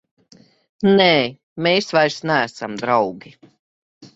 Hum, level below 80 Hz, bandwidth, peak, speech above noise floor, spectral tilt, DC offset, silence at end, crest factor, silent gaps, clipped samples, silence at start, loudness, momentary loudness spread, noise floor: none; -60 dBFS; 8 kHz; -2 dBFS; 34 dB; -5 dB/octave; under 0.1%; 0.1 s; 18 dB; 1.43-1.56 s, 3.59-4.01 s; under 0.1%; 0.8 s; -18 LUFS; 12 LU; -52 dBFS